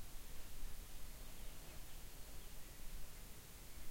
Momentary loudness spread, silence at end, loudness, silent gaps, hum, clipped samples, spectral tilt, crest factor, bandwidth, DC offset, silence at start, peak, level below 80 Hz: 1 LU; 0 s; -56 LUFS; none; none; under 0.1%; -3 dB/octave; 12 dB; 16.5 kHz; under 0.1%; 0 s; -34 dBFS; -54 dBFS